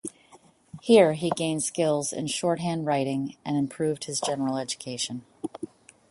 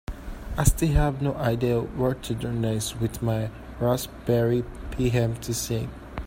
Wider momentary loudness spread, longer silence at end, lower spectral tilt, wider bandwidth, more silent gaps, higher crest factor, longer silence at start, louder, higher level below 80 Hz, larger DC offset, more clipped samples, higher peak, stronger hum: first, 17 LU vs 9 LU; first, 0.45 s vs 0 s; second, -4.5 dB/octave vs -6 dB/octave; second, 11.5 kHz vs 16.5 kHz; neither; about the same, 22 dB vs 20 dB; about the same, 0.05 s vs 0.1 s; about the same, -26 LUFS vs -26 LUFS; second, -68 dBFS vs -34 dBFS; neither; neither; about the same, -6 dBFS vs -4 dBFS; neither